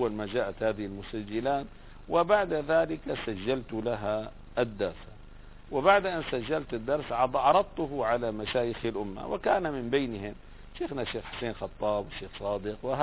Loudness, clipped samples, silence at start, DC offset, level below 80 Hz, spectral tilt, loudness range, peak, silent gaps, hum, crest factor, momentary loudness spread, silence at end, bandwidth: -30 LUFS; under 0.1%; 0 s; under 0.1%; -50 dBFS; -9.5 dB/octave; 5 LU; -8 dBFS; none; none; 20 dB; 12 LU; 0 s; 4 kHz